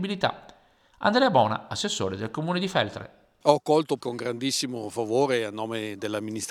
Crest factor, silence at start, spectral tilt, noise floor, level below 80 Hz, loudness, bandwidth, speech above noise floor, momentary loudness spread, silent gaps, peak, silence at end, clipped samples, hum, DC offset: 22 dB; 0 s; -4.5 dB/octave; -58 dBFS; -66 dBFS; -26 LUFS; 16 kHz; 33 dB; 10 LU; none; -4 dBFS; 0 s; under 0.1%; none; under 0.1%